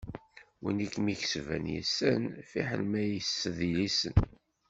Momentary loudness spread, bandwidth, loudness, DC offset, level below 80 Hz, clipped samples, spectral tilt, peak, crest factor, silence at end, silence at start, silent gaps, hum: 8 LU; 8 kHz; -32 LUFS; under 0.1%; -46 dBFS; under 0.1%; -5 dB/octave; -10 dBFS; 22 dB; 0.4 s; 0 s; none; none